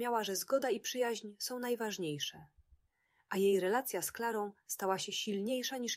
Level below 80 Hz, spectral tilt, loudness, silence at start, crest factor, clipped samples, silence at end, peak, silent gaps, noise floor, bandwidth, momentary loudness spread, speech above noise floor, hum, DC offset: -78 dBFS; -3 dB/octave; -36 LUFS; 0 s; 16 dB; under 0.1%; 0 s; -20 dBFS; none; -77 dBFS; 16 kHz; 8 LU; 41 dB; none; under 0.1%